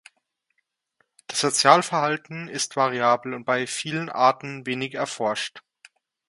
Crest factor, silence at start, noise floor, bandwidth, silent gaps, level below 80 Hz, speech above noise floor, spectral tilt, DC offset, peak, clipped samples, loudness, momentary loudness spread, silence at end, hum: 24 dB; 1.3 s; -75 dBFS; 11.5 kHz; none; -74 dBFS; 51 dB; -3 dB/octave; under 0.1%; 0 dBFS; under 0.1%; -23 LUFS; 13 LU; 0.7 s; none